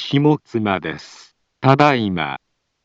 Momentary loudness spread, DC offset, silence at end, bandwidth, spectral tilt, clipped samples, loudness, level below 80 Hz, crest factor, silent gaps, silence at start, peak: 15 LU; under 0.1%; 0.5 s; 7.8 kHz; -7 dB/octave; under 0.1%; -18 LUFS; -56 dBFS; 18 dB; none; 0 s; 0 dBFS